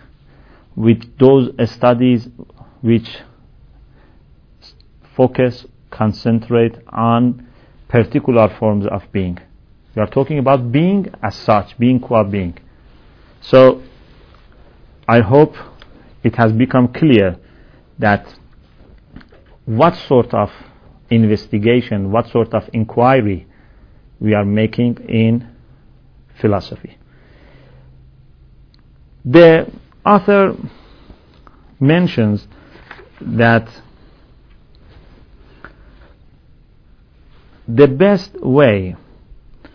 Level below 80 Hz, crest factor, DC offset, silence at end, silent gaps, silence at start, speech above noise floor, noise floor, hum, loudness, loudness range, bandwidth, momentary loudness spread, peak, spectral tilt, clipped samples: -44 dBFS; 16 dB; under 0.1%; 0.8 s; none; 0.75 s; 34 dB; -47 dBFS; none; -14 LUFS; 7 LU; 5.4 kHz; 15 LU; 0 dBFS; -9.5 dB/octave; 0.2%